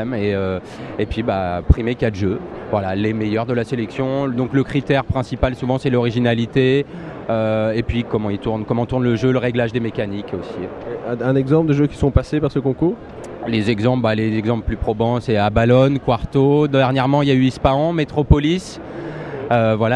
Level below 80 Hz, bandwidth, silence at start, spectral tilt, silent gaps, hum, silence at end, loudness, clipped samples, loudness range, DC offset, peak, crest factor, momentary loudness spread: -32 dBFS; 10 kHz; 0 s; -8 dB/octave; none; none; 0 s; -19 LUFS; under 0.1%; 5 LU; under 0.1%; 0 dBFS; 18 dB; 11 LU